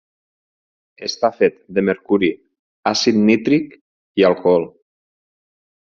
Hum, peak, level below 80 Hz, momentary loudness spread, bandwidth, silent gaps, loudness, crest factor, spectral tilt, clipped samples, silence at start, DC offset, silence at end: none; -2 dBFS; -60 dBFS; 13 LU; 7.4 kHz; 2.59-2.83 s, 3.81-4.15 s; -18 LUFS; 18 dB; -4 dB/octave; under 0.1%; 1 s; under 0.1%; 1.2 s